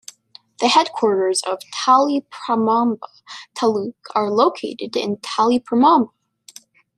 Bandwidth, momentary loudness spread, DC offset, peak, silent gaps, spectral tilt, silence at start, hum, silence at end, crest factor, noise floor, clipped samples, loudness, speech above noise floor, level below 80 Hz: 13 kHz; 13 LU; under 0.1%; -2 dBFS; none; -3.5 dB/octave; 0.6 s; none; 0.9 s; 18 dB; -48 dBFS; under 0.1%; -18 LUFS; 30 dB; -68 dBFS